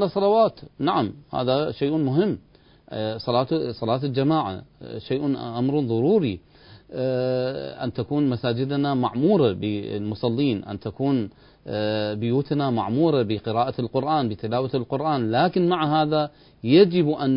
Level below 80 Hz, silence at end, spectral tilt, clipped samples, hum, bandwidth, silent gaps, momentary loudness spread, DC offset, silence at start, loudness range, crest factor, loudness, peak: -54 dBFS; 0 s; -12 dB/octave; under 0.1%; none; 5.4 kHz; none; 10 LU; under 0.1%; 0 s; 2 LU; 18 dB; -23 LUFS; -4 dBFS